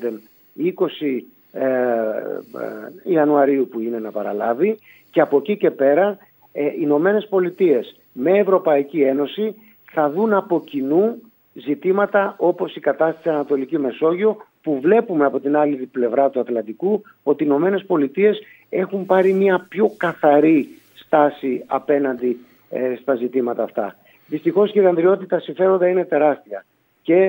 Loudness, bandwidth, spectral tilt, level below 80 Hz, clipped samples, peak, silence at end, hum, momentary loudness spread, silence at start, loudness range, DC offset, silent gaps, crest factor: -19 LUFS; 16.5 kHz; -8.5 dB/octave; -74 dBFS; under 0.1%; 0 dBFS; 0 s; none; 12 LU; 0 s; 3 LU; under 0.1%; none; 18 dB